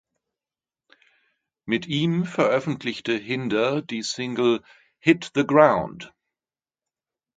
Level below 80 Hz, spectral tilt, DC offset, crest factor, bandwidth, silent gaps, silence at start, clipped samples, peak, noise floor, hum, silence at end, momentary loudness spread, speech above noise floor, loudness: -62 dBFS; -5.5 dB/octave; under 0.1%; 24 dB; 9.2 kHz; none; 1.65 s; under 0.1%; 0 dBFS; under -90 dBFS; none; 1.3 s; 11 LU; over 68 dB; -23 LUFS